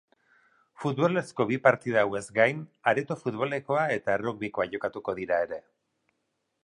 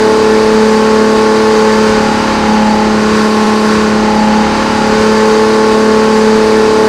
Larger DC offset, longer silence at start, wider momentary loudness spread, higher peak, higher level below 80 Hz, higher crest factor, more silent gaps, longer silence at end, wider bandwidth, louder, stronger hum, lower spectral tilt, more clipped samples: neither; first, 0.8 s vs 0 s; first, 9 LU vs 2 LU; second, -6 dBFS vs 0 dBFS; second, -68 dBFS vs -32 dBFS; first, 24 dB vs 8 dB; neither; first, 1.05 s vs 0 s; second, 11.5 kHz vs 13 kHz; second, -28 LUFS vs -8 LUFS; neither; about the same, -6 dB/octave vs -5 dB/octave; second, under 0.1% vs 1%